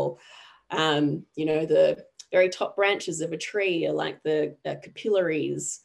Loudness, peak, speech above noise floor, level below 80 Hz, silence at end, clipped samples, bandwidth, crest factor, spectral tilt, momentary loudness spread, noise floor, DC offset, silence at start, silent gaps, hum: -26 LUFS; -8 dBFS; 26 dB; -72 dBFS; 0.05 s; under 0.1%; 12 kHz; 18 dB; -4 dB/octave; 10 LU; -51 dBFS; under 0.1%; 0 s; none; none